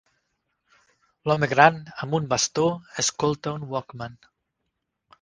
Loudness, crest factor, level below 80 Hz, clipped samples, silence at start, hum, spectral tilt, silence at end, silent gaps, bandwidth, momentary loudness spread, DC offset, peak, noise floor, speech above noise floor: -23 LUFS; 26 dB; -60 dBFS; under 0.1%; 1.25 s; none; -3.5 dB/octave; 1.05 s; none; 10.5 kHz; 16 LU; under 0.1%; 0 dBFS; -79 dBFS; 56 dB